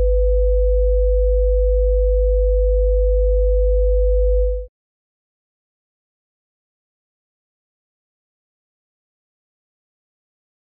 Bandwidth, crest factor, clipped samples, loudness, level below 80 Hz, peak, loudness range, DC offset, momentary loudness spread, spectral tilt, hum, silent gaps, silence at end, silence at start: 0.6 kHz; 10 dB; under 0.1%; -19 LUFS; -20 dBFS; -10 dBFS; 8 LU; under 0.1%; 0 LU; -14.5 dB/octave; none; none; 6.15 s; 0 s